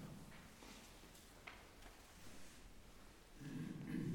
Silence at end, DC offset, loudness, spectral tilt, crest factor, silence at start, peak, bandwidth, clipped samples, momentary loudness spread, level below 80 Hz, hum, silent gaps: 0 s; under 0.1%; -56 LUFS; -5.5 dB/octave; 18 dB; 0 s; -34 dBFS; 19 kHz; under 0.1%; 13 LU; -66 dBFS; none; none